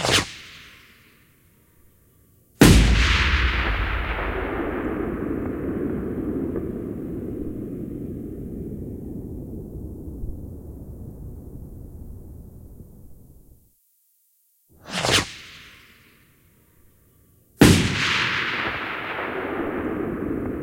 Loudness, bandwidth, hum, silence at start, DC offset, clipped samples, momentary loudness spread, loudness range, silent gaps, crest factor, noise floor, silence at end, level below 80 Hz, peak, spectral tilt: -23 LUFS; 16.5 kHz; none; 0 s; under 0.1%; under 0.1%; 24 LU; 18 LU; none; 24 dB; -64 dBFS; 0 s; -32 dBFS; 0 dBFS; -4.5 dB/octave